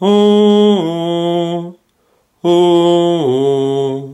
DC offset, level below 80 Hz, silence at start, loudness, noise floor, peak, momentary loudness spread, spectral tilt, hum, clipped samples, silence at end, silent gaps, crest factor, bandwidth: under 0.1%; -62 dBFS; 0 s; -12 LUFS; -58 dBFS; -2 dBFS; 10 LU; -7 dB/octave; none; under 0.1%; 0 s; none; 10 dB; 11.5 kHz